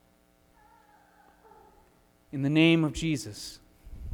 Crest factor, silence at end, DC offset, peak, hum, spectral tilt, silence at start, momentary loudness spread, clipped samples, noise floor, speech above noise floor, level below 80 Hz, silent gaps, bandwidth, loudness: 20 dB; 0 s; under 0.1%; -10 dBFS; none; -5.5 dB/octave; 2.35 s; 20 LU; under 0.1%; -64 dBFS; 38 dB; -50 dBFS; none; 15 kHz; -26 LUFS